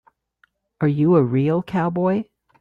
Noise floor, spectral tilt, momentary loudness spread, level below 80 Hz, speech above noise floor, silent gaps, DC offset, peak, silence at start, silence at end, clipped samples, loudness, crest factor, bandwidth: -63 dBFS; -10.5 dB/octave; 8 LU; -58 dBFS; 45 dB; none; under 0.1%; -6 dBFS; 0.8 s; 0.4 s; under 0.1%; -20 LUFS; 16 dB; 5.2 kHz